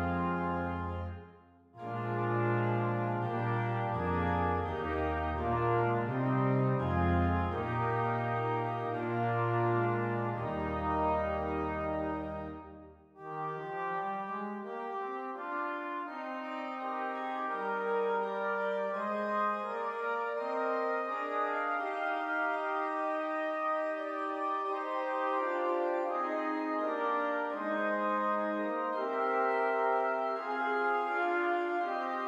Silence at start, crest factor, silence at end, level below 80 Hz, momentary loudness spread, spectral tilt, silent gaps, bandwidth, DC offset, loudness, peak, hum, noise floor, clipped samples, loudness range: 0 s; 14 dB; 0 s; -54 dBFS; 8 LU; -8.5 dB/octave; none; 8 kHz; under 0.1%; -33 LUFS; -18 dBFS; none; -58 dBFS; under 0.1%; 6 LU